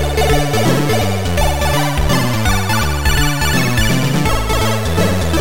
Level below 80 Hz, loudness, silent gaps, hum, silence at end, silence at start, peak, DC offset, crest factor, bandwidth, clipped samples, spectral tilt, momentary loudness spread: -22 dBFS; -15 LUFS; none; none; 0 s; 0 s; -2 dBFS; 7%; 12 dB; 17 kHz; under 0.1%; -4.5 dB/octave; 2 LU